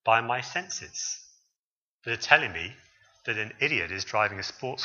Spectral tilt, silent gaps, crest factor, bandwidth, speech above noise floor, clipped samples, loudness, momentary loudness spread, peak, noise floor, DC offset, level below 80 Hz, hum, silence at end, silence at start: -2 dB/octave; 1.59-1.99 s; 30 dB; 7.4 kHz; over 62 dB; under 0.1%; -27 LUFS; 15 LU; 0 dBFS; under -90 dBFS; under 0.1%; -64 dBFS; none; 0 s; 0.05 s